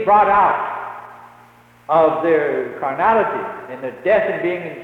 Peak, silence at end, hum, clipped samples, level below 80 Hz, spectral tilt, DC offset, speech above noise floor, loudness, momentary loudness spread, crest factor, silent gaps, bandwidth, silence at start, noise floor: -4 dBFS; 0 s; none; under 0.1%; -54 dBFS; -7 dB/octave; under 0.1%; 31 dB; -17 LUFS; 15 LU; 14 dB; none; 6.2 kHz; 0 s; -48 dBFS